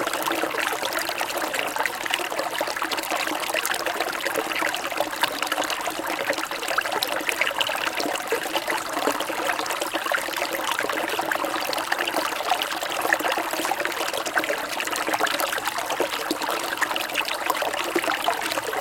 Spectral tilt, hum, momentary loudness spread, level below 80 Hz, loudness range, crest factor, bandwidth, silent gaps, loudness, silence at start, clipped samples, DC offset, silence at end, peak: -1 dB/octave; none; 3 LU; -62 dBFS; 1 LU; 24 dB; 17 kHz; none; -25 LUFS; 0 s; under 0.1%; under 0.1%; 0 s; -2 dBFS